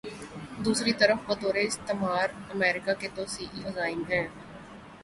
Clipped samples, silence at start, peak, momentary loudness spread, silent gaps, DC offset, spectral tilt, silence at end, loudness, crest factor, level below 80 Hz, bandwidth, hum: under 0.1%; 0.05 s; -8 dBFS; 17 LU; none; under 0.1%; -3.5 dB/octave; 0 s; -28 LUFS; 22 dB; -60 dBFS; 11.5 kHz; none